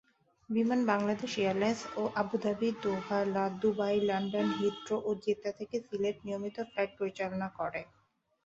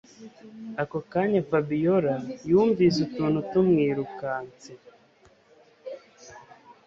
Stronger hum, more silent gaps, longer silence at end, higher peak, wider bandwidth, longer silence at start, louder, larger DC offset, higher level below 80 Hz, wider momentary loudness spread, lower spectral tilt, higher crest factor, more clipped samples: neither; neither; first, 0.6 s vs 0.15 s; second, -14 dBFS vs -10 dBFS; about the same, 7.8 kHz vs 7.6 kHz; first, 0.5 s vs 0.2 s; second, -33 LUFS vs -25 LUFS; neither; second, -70 dBFS vs -62 dBFS; second, 8 LU vs 21 LU; second, -6 dB/octave vs -7.5 dB/octave; about the same, 20 dB vs 16 dB; neither